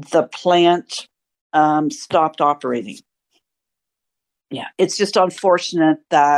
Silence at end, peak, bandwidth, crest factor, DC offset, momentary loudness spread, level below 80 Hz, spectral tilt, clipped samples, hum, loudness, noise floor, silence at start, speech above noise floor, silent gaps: 0 s; -2 dBFS; 12 kHz; 16 dB; under 0.1%; 15 LU; -70 dBFS; -4.5 dB/octave; under 0.1%; none; -17 LUFS; -83 dBFS; 0 s; 66 dB; 1.41-1.50 s